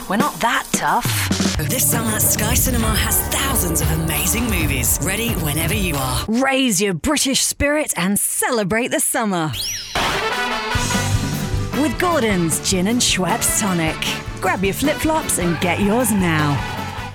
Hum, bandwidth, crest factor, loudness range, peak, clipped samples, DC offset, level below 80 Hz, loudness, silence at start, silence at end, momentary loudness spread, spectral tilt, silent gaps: none; over 20 kHz; 16 dB; 2 LU; -2 dBFS; under 0.1%; under 0.1%; -32 dBFS; -18 LUFS; 0 s; 0 s; 5 LU; -3.5 dB/octave; none